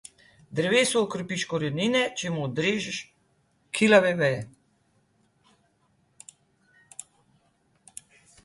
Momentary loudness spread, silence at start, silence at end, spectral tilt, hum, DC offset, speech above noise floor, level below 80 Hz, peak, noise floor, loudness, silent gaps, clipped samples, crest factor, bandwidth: 25 LU; 0.5 s; 3.95 s; -4 dB/octave; none; under 0.1%; 43 dB; -66 dBFS; -4 dBFS; -68 dBFS; -25 LUFS; none; under 0.1%; 24 dB; 11.5 kHz